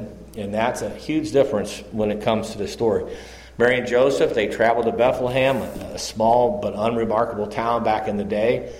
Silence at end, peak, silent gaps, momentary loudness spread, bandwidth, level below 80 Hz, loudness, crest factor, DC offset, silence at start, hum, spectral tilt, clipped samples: 0 s; -6 dBFS; none; 11 LU; 16 kHz; -46 dBFS; -21 LUFS; 16 dB; under 0.1%; 0 s; none; -5.5 dB/octave; under 0.1%